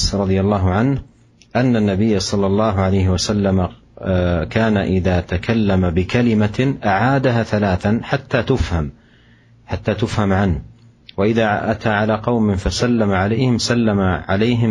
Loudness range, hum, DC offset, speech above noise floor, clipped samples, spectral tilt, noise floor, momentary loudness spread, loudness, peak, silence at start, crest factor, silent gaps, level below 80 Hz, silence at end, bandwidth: 3 LU; none; under 0.1%; 33 dB; under 0.1%; -6.5 dB/octave; -49 dBFS; 5 LU; -17 LUFS; -2 dBFS; 0 s; 14 dB; none; -34 dBFS; 0 s; 11.5 kHz